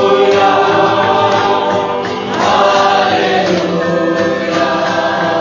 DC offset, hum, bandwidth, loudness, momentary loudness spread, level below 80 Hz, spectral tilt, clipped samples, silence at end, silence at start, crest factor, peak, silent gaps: under 0.1%; none; 7.4 kHz; -12 LUFS; 5 LU; -48 dBFS; -5 dB/octave; under 0.1%; 0 s; 0 s; 12 dB; 0 dBFS; none